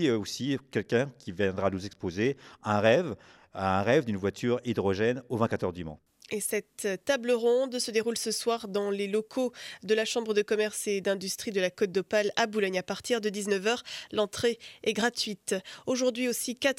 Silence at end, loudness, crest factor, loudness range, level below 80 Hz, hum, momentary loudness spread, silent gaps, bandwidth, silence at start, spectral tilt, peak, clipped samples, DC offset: 0.05 s; -29 LUFS; 20 dB; 2 LU; -66 dBFS; none; 7 LU; none; 16.5 kHz; 0 s; -4 dB/octave; -8 dBFS; under 0.1%; under 0.1%